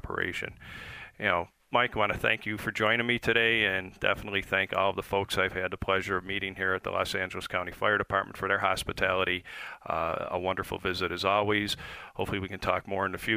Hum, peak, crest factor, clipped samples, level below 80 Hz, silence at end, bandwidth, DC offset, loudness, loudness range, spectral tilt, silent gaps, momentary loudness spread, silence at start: none; -8 dBFS; 22 dB; under 0.1%; -52 dBFS; 0 s; 15.5 kHz; under 0.1%; -29 LUFS; 3 LU; -4.5 dB/octave; none; 8 LU; 0.05 s